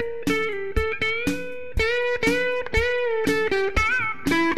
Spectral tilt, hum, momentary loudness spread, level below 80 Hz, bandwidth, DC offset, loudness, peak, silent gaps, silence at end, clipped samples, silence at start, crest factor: -4.5 dB/octave; none; 5 LU; -36 dBFS; 14.5 kHz; 2%; -23 LUFS; -8 dBFS; none; 0 s; under 0.1%; 0 s; 16 dB